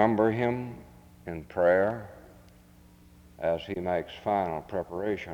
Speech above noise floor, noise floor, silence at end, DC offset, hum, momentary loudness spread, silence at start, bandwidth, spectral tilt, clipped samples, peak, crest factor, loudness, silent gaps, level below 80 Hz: 27 dB; -55 dBFS; 0 s; under 0.1%; none; 17 LU; 0 s; 19.5 kHz; -7.5 dB/octave; under 0.1%; -8 dBFS; 22 dB; -29 LUFS; none; -58 dBFS